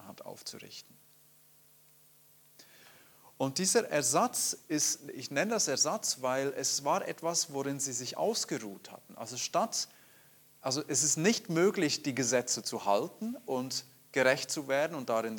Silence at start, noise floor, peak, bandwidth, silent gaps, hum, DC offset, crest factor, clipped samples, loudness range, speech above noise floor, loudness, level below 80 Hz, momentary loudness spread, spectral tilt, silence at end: 0 s; -62 dBFS; -10 dBFS; 19 kHz; none; none; under 0.1%; 22 dB; under 0.1%; 5 LU; 30 dB; -31 LUFS; -84 dBFS; 13 LU; -2.5 dB/octave; 0 s